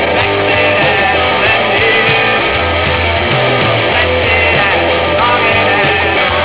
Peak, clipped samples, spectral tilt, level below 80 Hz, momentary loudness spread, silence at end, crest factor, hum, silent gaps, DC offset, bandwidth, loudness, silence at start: -4 dBFS; under 0.1%; -8 dB/octave; -28 dBFS; 3 LU; 0 s; 8 dB; none; none; 0.9%; 4 kHz; -10 LUFS; 0 s